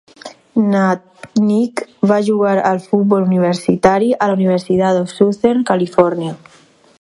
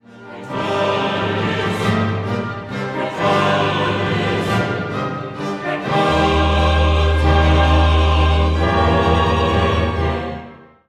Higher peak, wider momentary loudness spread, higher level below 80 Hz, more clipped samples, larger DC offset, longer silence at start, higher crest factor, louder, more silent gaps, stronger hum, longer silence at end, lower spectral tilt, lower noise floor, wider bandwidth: about the same, 0 dBFS vs -2 dBFS; second, 7 LU vs 10 LU; second, -54 dBFS vs -22 dBFS; neither; neither; about the same, 0.25 s vs 0.15 s; about the same, 14 dB vs 14 dB; about the same, -15 LUFS vs -17 LUFS; neither; neither; first, 0.65 s vs 0.3 s; about the same, -7 dB/octave vs -6.5 dB/octave; second, -33 dBFS vs -38 dBFS; first, 11.5 kHz vs 10 kHz